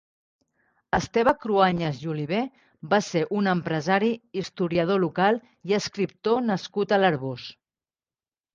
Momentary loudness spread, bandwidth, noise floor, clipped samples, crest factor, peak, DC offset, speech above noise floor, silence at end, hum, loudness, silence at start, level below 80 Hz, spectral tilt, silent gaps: 9 LU; 7.6 kHz; under -90 dBFS; under 0.1%; 20 dB; -6 dBFS; under 0.1%; over 66 dB; 1.05 s; none; -25 LUFS; 0.95 s; -56 dBFS; -6 dB/octave; none